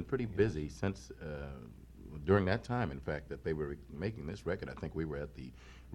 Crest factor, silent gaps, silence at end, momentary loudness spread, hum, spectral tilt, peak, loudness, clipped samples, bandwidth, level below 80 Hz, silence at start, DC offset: 24 dB; none; 0 s; 19 LU; none; -7.5 dB/octave; -14 dBFS; -37 LUFS; under 0.1%; 12 kHz; -52 dBFS; 0 s; under 0.1%